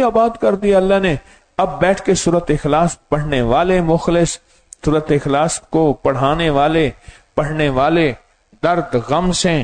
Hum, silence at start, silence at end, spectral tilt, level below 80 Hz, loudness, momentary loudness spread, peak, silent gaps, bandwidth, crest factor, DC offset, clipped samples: none; 0 s; 0 s; -5.5 dB/octave; -34 dBFS; -16 LUFS; 7 LU; -4 dBFS; none; 9.4 kHz; 12 dB; under 0.1%; under 0.1%